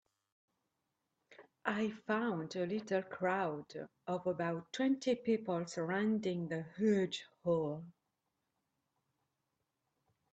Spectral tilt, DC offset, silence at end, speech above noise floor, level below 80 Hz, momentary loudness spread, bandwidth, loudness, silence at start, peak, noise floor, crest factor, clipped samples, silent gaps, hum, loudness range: -6 dB/octave; under 0.1%; 2.45 s; 50 dB; -80 dBFS; 8 LU; 8.6 kHz; -37 LUFS; 1.3 s; -18 dBFS; -86 dBFS; 22 dB; under 0.1%; none; none; 4 LU